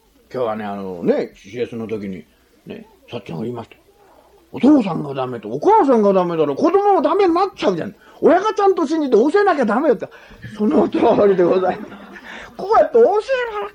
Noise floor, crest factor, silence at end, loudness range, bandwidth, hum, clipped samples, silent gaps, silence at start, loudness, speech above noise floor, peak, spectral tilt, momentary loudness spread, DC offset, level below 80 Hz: -50 dBFS; 14 dB; 0.05 s; 10 LU; 9.8 kHz; none; under 0.1%; none; 0.35 s; -17 LUFS; 34 dB; -4 dBFS; -7 dB/octave; 20 LU; under 0.1%; -56 dBFS